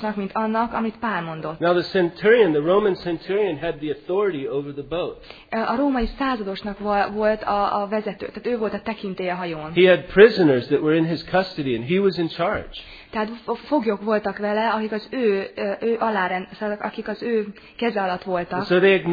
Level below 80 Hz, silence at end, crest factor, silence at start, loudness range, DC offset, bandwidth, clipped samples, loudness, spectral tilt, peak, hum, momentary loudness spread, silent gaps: -48 dBFS; 0 s; 22 dB; 0 s; 6 LU; under 0.1%; 5 kHz; under 0.1%; -22 LUFS; -8 dB/octave; 0 dBFS; none; 12 LU; none